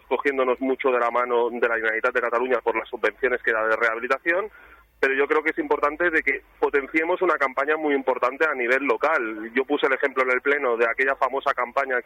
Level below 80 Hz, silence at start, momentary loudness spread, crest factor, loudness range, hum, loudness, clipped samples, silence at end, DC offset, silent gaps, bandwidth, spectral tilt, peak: -60 dBFS; 0.1 s; 4 LU; 16 dB; 1 LU; none; -23 LUFS; under 0.1%; 0.05 s; under 0.1%; none; 14 kHz; -4.5 dB/octave; -6 dBFS